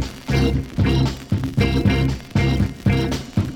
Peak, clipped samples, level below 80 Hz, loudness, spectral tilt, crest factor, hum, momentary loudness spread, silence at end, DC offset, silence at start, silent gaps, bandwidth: -4 dBFS; under 0.1%; -28 dBFS; -20 LUFS; -7 dB/octave; 16 dB; none; 5 LU; 0 s; under 0.1%; 0 s; none; 16.5 kHz